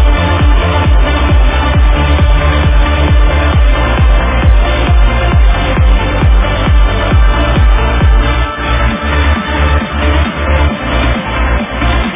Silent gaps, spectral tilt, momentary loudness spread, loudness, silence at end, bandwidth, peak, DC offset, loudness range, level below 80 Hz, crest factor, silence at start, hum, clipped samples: none; -10 dB/octave; 3 LU; -11 LUFS; 0 s; 3.8 kHz; 0 dBFS; under 0.1%; 2 LU; -10 dBFS; 8 dB; 0 s; none; under 0.1%